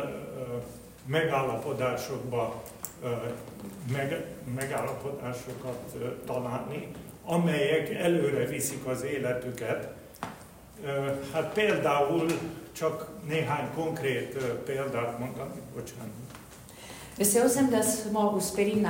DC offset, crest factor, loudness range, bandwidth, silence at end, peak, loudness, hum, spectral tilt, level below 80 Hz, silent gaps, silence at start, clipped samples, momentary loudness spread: under 0.1%; 20 dB; 6 LU; 16.5 kHz; 0 s; -10 dBFS; -30 LUFS; none; -5 dB/octave; -60 dBFS; none; 0 s; under 0.1%; 16 LU